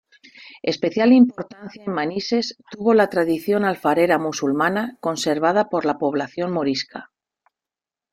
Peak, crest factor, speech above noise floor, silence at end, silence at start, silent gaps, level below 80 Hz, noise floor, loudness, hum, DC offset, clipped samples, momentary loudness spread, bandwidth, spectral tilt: -4 dBFS; 16 dB; 70 dB; 1.1 s; 0.4 s; none; -64 dBFS; -90 dBFS; -20 LUFS; none; under 0.1%; under 0.1%; 12 LU; 15.5 kHz; -5 dB/octave